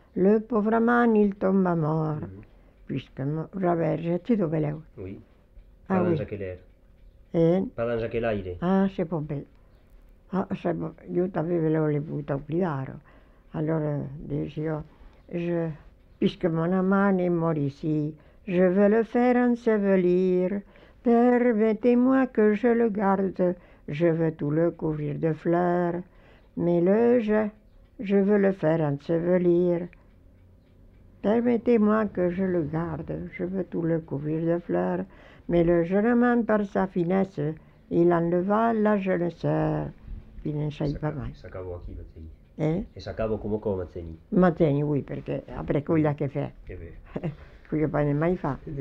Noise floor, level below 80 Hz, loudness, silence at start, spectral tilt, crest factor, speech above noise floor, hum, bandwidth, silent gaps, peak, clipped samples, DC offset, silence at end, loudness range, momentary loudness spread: -55 dBFS; -50 dBFS; -25 LUFS; 0.15 s; -10 dB/octave; 16 dB; 30 dB; none; 6 kHz; none; -8 dBFS; under 0.1%; under 0.1%; 0 s; 7 LU; 15 LU